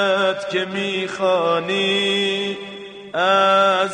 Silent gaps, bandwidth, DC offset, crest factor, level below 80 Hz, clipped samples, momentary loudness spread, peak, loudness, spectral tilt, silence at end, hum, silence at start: none; 10 kHz; under 0.1%; 16 dB; -66 dBFS; under 0.1%; 13 LU; -4 dBFS; -18 LUFS; -4 dB/octave; 0 s; none; 0 s